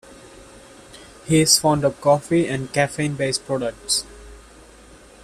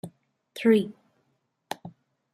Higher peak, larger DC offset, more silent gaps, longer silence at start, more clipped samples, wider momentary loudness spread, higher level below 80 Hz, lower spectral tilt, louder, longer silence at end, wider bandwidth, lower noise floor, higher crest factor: first, -2 dBFS vs -10 dBFS; neither; neither; first, 0.25 s vs 0.05 s; neither; second, 11 LU vs 22 LU; first, -50 dBFS vs -74 dBFS; second, -3.5 dB/octave vs -6.5 dB/octave; first, -20 LUFS vs -24 LUFS; first, 0.85 s vs 0.45 s; about the same, 14.5 kHz vs 14.5 kHz; second, -46 dBFS vs -74 dBFS; about the same, 22 dB vs 20 dB